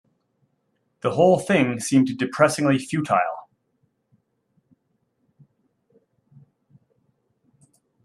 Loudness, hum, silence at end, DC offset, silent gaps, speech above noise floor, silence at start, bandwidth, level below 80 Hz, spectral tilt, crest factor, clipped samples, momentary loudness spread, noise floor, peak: -21 LUFS; none; 4.65 s; under 0.1%; none; 52 dB; 1.05 s; 13 kHz; -66 dBFS; -5.5 dB/octave; 22 dB; under 0.1%; 9 LU; -71 dBFS; -2 dBFS